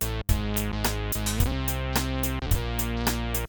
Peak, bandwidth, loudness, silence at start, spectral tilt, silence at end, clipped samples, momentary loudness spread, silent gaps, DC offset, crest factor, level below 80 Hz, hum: -10 dBFS; over 20 kHz; -27 LUFS; 0 s; -4.5 dB/octave; 0 s; under 0.1%; 2 LU; none; under 0.1%; 16 dB; -30 dBFS; none